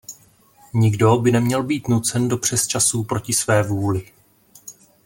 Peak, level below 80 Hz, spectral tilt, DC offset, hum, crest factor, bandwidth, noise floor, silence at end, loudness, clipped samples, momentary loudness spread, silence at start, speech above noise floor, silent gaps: -4 dBFS; -54 dBFS; -4.5 dB/octave; under 0.1%; none; 18 dB; 17 kHz; -53 dBFS; 0.35 s; -19 LUFS; under 0.1%; 10 LU; 0.1 s; 34 dB; none